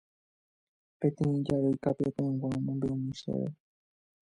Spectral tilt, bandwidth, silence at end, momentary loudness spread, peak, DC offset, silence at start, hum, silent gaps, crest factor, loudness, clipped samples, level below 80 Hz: -9 dB/octave; 11 kHz; 0.7 s; 6 LU; -14 dBFS; under 0.1%; 1 s; none; none; 18 dB; -32 LUFS; under 0.1%; -62 dBFS